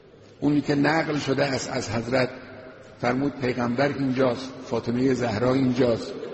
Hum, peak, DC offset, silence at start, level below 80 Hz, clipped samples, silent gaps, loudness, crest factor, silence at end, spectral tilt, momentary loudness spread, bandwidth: none; -10 dBFS; under 0.1%; 0.4 s; -54 dBFS; under 0.1%; none; -24 LUFS; 16 dB; 0 s; -6 dB/octave; 8 LU; 8.2 kHz